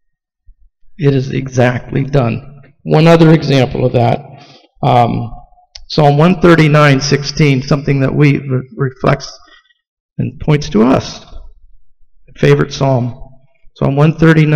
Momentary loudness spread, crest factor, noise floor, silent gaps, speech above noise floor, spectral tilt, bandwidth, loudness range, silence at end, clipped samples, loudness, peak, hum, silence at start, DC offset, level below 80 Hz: 13 LU; 12 dB; -47 dBFS; 9.87-10.09 s; 36 dB; -7 dB/octave; 8.4 kHz; 6 LU; 0 s; under 0.1%; -12 LUFS; 0 dBFS; none; 0.85 s; under 0.1%; -36 dBFS